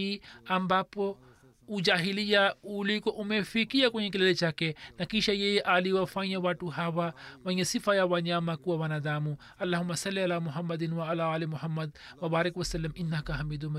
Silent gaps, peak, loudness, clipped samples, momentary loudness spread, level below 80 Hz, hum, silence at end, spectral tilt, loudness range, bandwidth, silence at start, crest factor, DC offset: none; -12 dBFS; -30 LUFS; under 0.1%; 9 LU; -54 dBFS; none; 0 s; -5 dB/octave; 4 LU; 13.5 kHz; 0 s; 18 dB; under 0.1%